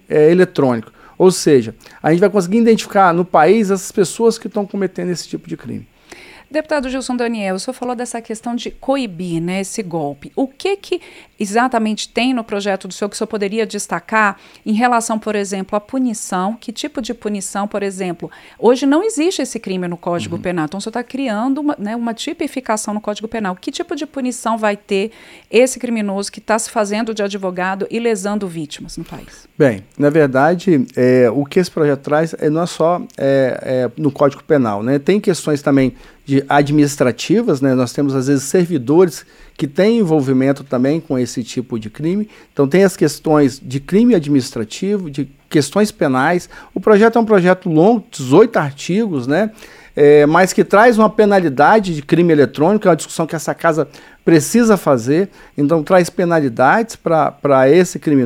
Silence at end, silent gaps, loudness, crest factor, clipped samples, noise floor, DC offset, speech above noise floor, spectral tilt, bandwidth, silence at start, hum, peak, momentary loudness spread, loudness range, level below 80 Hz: 0 s; none; -16 LUFS; 16 dB; under 0.1%; -40 dBFS; under 0.1%; 25 dB; -5.5 dB/octave; 16 kHz; 0.1 s; none; 0 dBFS; 12 LU; 8 LU; -50 dBFS